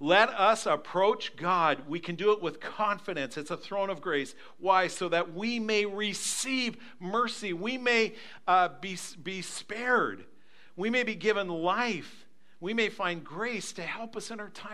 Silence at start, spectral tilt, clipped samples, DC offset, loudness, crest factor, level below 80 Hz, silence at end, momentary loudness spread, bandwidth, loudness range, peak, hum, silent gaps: 0 s; -3 dB/octave; under 0.1%; 0.4%; -29 LUFS; 24 dB; -82 dBFS; 0 s; 12 LU; 14.5 kHz; 2 LU; -6 dBFS; none; none